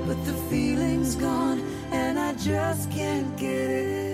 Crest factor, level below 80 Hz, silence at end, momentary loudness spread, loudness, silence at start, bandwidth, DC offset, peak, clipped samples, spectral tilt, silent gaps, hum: 12 dB; -46 dBFS; 0 s; 4 LU; -27 LUFS; 0 s; 16 kHz; under 0.1%; -14 dBFS; under 0.1%; -5.5 dB/octave; none; none